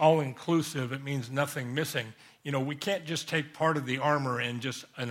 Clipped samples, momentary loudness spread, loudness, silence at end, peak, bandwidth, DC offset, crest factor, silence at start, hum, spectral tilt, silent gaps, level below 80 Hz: under 0.1%; 7 LU; -31 LUFS; 0 s; -10 dBFS; 16 kHz; under 0.1%; 20 dB; 0 s; none; -5 dB/octave; none; -72 dBFS